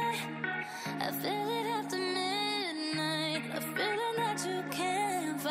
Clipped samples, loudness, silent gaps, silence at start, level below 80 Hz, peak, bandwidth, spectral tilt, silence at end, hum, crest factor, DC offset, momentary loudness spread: under 0.1%; -33 LUFS; none; 0 s; -80 dBFS; -20 dBFS; 16 kHz; -3.5 dB/octave; 0 s; none; 14 dB; under 0.1%; 4 LU